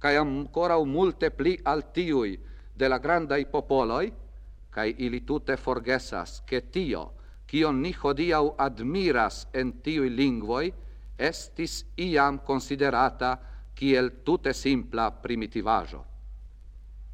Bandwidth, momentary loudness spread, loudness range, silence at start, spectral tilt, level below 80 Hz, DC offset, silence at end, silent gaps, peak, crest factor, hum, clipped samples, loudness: 15 kHz; 11 LU; 3 LU; 0 s; -5.5 dB/octave; -42 dBFS; under 0.1%; 0 s; none; -8 dBFS; 18 dB; none; under 0.1%; -27 LUFS